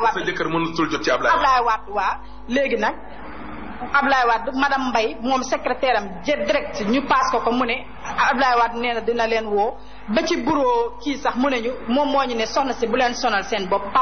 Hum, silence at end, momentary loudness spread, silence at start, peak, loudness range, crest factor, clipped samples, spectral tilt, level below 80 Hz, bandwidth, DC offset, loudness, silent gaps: none; 0 s; 8 LU; 0 s; -6 dBFS; 1 LU; 14 dB; under 0.1%; -2 dB/octave; -44 dBFS; 6.6 kHz; 2%; -21 LUFS; none